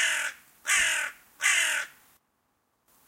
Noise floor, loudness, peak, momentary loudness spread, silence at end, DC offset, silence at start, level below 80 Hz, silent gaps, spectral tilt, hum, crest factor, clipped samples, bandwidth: -74 dBFS; -26 LUFS; -8 dBFS; 13 LU; 1.2 s; under 0.1%; 0 s; -68 dBFS; none; 3.5 dB/octave; none; 22 dB; under 0.1%; 16.5 kHz